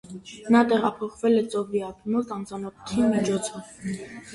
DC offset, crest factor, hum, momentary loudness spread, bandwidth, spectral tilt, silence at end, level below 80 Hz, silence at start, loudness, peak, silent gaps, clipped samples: under 0.1%; 20 dB; none; 15 LU; 11.5 kHz; -5.5 dB/octave; 0 s; -58 dBFS; 0.05 s; -25 LUFS; -6 dBFS; none; under 0.1%